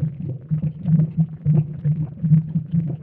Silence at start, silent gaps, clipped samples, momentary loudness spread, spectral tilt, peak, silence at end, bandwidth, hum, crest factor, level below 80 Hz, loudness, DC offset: 0 s; none; under 0.1%; 7 LU; -14 dB/octave; -6 dBFS; 0 s; 2.2 kHz; none; 14 dB; -52 dBFS; -21 LUFS; under 0.1%